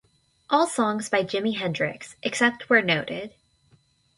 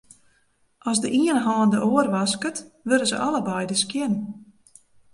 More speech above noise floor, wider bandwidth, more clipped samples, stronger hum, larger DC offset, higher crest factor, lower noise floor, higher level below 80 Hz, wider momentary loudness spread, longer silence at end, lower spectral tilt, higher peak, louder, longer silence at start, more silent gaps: second, 38 dB vs 42 dB; about the same, 11.5 kHz vs 11.5 kHz; neither; neither; neither; about the same, 20 dB vs 18 dB; about the same, -62 dBFS vs -65 dBFS; about the same, -66 dBFS vs -66 dBFS; about the same, 12 LU vs 11 LU; first, 0.9 s vs 0.7 s; about the same, -4 dB/octave vs -4 dB/octave; about the same, -6 dBFS vs -6 dBFS; about the same, -24 LUFS vs -23 LUFS; second, 0.5 s vs 0.85 s; neither